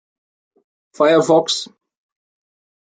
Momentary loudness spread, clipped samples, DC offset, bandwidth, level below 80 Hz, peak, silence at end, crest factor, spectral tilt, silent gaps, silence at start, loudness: 11 LU; under 0.1%; under 0.1%; 9.4 kHz; -70 dBFS; -2 dBFS; 1.3 s; 18 dB; -4 dB/octave; none; 1 s; -16 LUFS